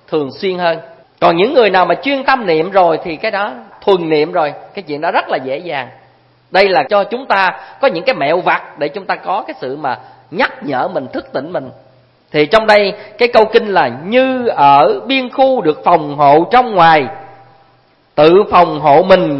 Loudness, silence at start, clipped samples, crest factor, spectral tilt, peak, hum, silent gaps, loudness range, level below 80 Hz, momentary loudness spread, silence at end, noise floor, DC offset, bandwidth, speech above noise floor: -12 LUFS; 0.1 s; 0.1%; 12 dB; -6.5 dB/octave; 0 dBFS; none; none; 7 LU; -50 dBFS; 13 LU; 0 s; -51 dBFS; under 0.1%; 8.6 kHz; 39 dB